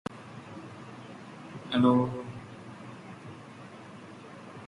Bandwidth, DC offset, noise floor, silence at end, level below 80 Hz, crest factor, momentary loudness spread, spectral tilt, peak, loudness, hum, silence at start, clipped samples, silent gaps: 10.5 kHz; under 0.1%; -47 dBFS; 0 s; -66 dBFS; 22 dB; 22 LU; -7.5 dB/octave; -12 dBFS; -28 LUFS; none; 0.1 s; under 0.1%; none